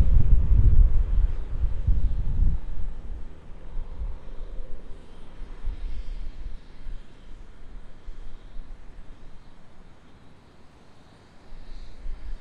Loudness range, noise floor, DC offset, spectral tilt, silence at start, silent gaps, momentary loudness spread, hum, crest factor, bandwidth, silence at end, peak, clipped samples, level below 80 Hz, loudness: 23 LU; -49 dBFS; under 0.1%; -9 dB/octave; 0 s; none; 26 LU; none; 18 dB; 3.9 kHz; 0.05 s; -6 dBFS; under 0.1%; -26 dBFS; -28 LUFS